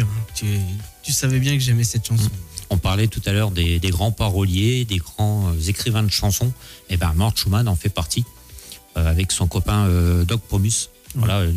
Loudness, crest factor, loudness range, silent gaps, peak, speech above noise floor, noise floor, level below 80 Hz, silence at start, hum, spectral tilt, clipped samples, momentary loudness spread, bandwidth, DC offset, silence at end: -20 LUFS; 12 dB; 1 LU; none; -8 dBFS; 21 dB; -40 dBFS; -34 dBFS; 0 s; none; -4.5 dB/octave; under 0.1%; 7 LU; 16 kHz; under 0.1%; 0 s